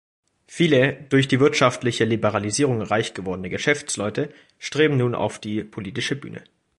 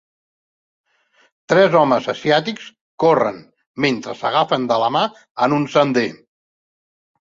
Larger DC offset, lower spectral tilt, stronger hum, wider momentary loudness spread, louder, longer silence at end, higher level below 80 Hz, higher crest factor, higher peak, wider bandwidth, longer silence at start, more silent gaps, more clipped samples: neither; about the same, -5 dB/octave vs -5.5 dB/octave; neither; first, 13 LU vs 10 LU; second, -22 LUFS vs -18 LUFS; second, 0.4 s vs 1.25 s; first, -56 dBFS vs -62 dBFS; about the same, 20 dB vs 18 dB; about the same, -2 dBFS vs -2 dBFS; first, 11.5 kHz vs 7.6 kHz; second, 0.5 s vs 1.5 s; second, none vs 2.81-2.98 s, 3.67-3.74 s, 5.31-5.35 s; neither